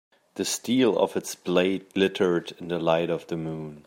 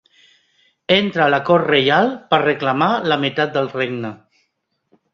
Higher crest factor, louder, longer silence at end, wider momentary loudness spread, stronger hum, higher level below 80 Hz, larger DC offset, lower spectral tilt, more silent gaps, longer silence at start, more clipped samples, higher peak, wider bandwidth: about the same, 18 dB vs 18 dB; second, -26 LUFS vs -17 LUFS; second, 0.05 s vs 1 s; about the same, 10 LU vs 9 LU; neither; second, -68 dBFS vs -60 dBFS; neither; second, -4.5 dB/octave vs -6.5 dB/octave; neither; second, 0.35 s vs 0.9 s; neither; second, -8 dBFS vs -2 dBFS; first, 16 kHz vs 7.2 kHz